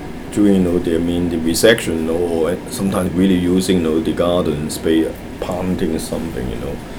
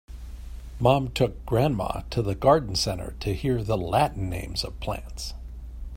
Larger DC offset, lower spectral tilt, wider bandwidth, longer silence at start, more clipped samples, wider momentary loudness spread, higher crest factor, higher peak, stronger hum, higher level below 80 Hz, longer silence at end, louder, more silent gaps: neither; about the same, -5.5 dB/octave vs -5.5 dB/octave; first, over 20 kHz vs 16.5 kHz; about the same, 0 s vs 0.1 s; neither; second, 10 LU vs 19 LU; second, 16 dB vs 22 dB; first, 0 dBFS vs -4 dBFS; neither; about the same, -36 dBFS vs -38 dBFS; about the same, 0 s vs 0 s; first, -17 LUFS vs -26 LUFS; neither